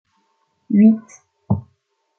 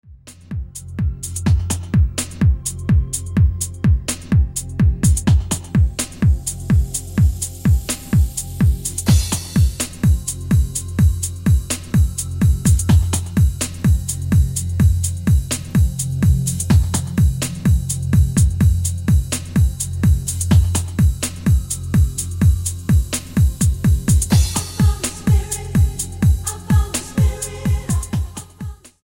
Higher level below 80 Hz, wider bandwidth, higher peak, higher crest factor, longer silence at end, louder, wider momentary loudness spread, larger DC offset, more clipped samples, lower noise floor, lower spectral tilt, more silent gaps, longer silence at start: second, -58 dBFS vs -22 dBFS; second, 6.8 kHz vs 17 kHz; about the same, -2 dBFS vs -2 dBFS; about the same, 16 dB vs 14 dB; first, 0.6 s vs 0.3 s; about the same, -17 LUFS vs -18 LUFS; first, 11 LU vs 6 LU; neither; neither; first, -67 dBFS vs -37 dBFS; first, -10 dB/octave vs -5.5 dB/octave; neither; first, 0.7 s vs 0.1 s